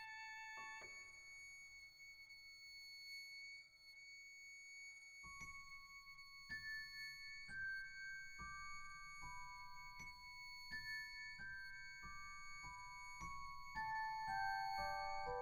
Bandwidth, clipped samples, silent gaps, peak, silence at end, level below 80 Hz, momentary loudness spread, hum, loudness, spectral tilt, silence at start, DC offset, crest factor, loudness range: over 20 kHz; under 0.1%; none; -34 dBFS; 0 s; -66 dBFS; 12 LU; none; -51 LUFS; -1.5 dB/octave; 0 s; under 0.1%; 18 dB; 7 LU